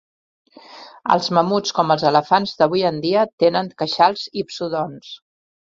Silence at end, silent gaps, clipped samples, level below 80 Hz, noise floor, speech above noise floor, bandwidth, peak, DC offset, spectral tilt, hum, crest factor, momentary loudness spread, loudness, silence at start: 0.5 s; 3.33-3.38 s; under 0.1%; -62 dBFS; -42 dBFS; 23 dB; 7.8 kHz; -2 dBFS; under 0.1%; -5 dB/octave; none; 18 dB; 11 LU; -19 LUFS; 0.7 s